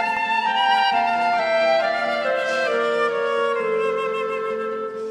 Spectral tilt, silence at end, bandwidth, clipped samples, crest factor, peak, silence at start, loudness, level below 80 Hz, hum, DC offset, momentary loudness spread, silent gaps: -3 dB/octave; 0 s; 12 kHz; under 0.1%; 14 dB; -8 dBFS; 0 s; -21 LUFS; -68 dBFS; none; under 0.1%; 7 LU; none